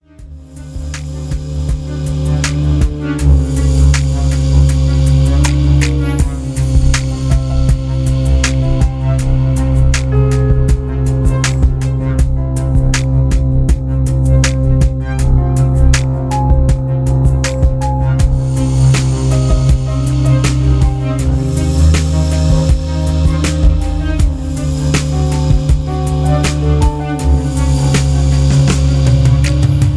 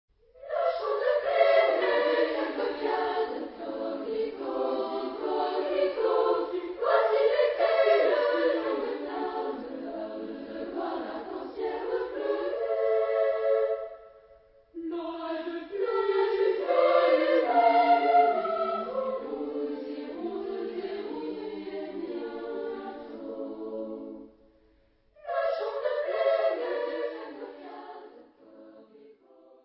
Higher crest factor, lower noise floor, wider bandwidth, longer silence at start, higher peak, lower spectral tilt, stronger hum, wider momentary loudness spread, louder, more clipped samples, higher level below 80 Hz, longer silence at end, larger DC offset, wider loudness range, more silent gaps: second, 12 dB vs 20 dB; second, -33 dBFS vs -64 dBFS; first, 11 kHz vs 5.8 kHz; second, 0.2 s vs 0.4 s; first, 0 dBFS vs -10 dBFS; about the same, -6.5 dB/octave vs -7.5 dB/octave; neither; second, 5 LU vs 15 LU; first, -13 LUFS vs -28 LUFS; neither; first, -14 dBFS vs -68 dBFS; second, 0 s vs 0.5 s; neither; second, 2 LU vs 12 LU; neither